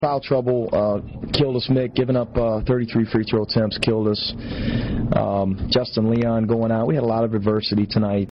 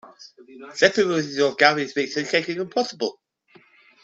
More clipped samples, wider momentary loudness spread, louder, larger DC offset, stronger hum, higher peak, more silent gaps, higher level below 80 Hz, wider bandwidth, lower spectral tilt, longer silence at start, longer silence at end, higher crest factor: neither; second, 4 LU vs 10 LU; about the same, -21 LUFS vs -21 LUFS; neither; neither; second, -8 dBFS vs -2 dBFS; neither; first, -38 dBFS vs -68 dBFS; second, 6 kHz vs 8 kHz; first, -6 dB/octave vs -3.5 dB/octave; about the same, 0 s vs 0.05 s; second, 0 s vs 0.95 s; second, 12 dB vs 22 dB